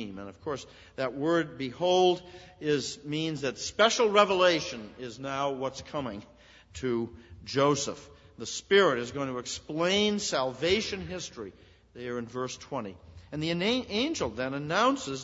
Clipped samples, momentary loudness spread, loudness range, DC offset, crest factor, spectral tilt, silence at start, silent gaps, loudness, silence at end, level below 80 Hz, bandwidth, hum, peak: under 0.1%; 17 LU; 6 LU; under 0.1%; 24 dB; -4 dB/octave; 0 s; none; -29 LUFS; 0 s; -60 dBFS; 8 kHz; none; -6 dBFS